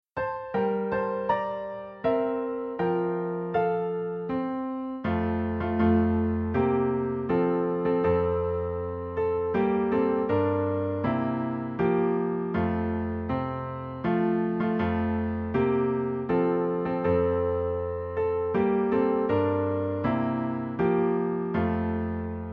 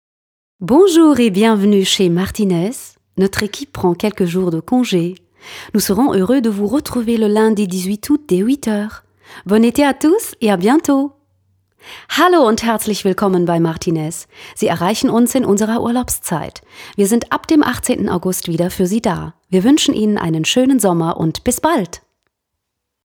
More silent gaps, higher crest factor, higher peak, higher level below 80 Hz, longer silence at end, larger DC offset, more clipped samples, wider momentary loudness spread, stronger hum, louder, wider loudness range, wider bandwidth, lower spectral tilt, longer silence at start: neither; about the same, 14 dB vs 16 dB; second, -12 dBFS vs 0 dBFS; about the same, -48 dBFS vs -46 dBFS; second, 0 s vs 1.1 s; neither; neither; second, 6 LU vs 10 LU; neither; second, -27 LUFS vs -15 LUFS; about the same, 3 LU vs 3 LU; second, 5.2 kHz vs 20 kHz; first, -10.5 dB/octave vs -5 dB/octave; second, 0.15 s vs 0.6 s